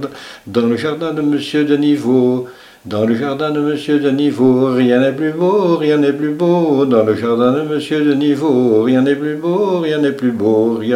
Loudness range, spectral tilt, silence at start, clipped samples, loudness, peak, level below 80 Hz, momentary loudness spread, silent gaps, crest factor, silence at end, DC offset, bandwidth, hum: 3 LU; -7.5 dB/octave; 0 s; under 0.1%; -14 LUFS; 0 dBFS; -60 dBFS; 5 LU; none; 14 dB; 0 s; under 0.1%; 13 kHz; none